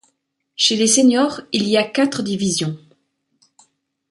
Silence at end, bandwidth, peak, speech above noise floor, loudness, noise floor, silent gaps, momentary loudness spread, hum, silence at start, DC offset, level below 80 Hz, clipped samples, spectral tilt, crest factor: 1.35 s; 11.5 kHz; -4 dBFS; 52 dB; -17 LUFS; -69 dBFS; none; 11 LU; none; 0.6 s; under 0.1%; -62 dBFS; under 0.1%; -3 dB/octave; 16 dB